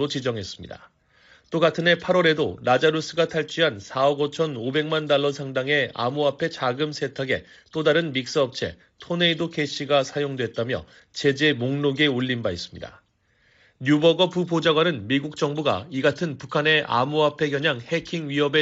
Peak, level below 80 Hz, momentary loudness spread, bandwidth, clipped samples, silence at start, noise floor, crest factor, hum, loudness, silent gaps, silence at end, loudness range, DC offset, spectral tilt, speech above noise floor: -6 dBFS; -60 dBFS; 10 LU; 8 kHz; under 0.1%; 0 s; -64 dBFS; 18 dB; none; -23 LUFS; none; 0 s; 3 LU; under 0.1%; -3.5 dB/octave; 41 dB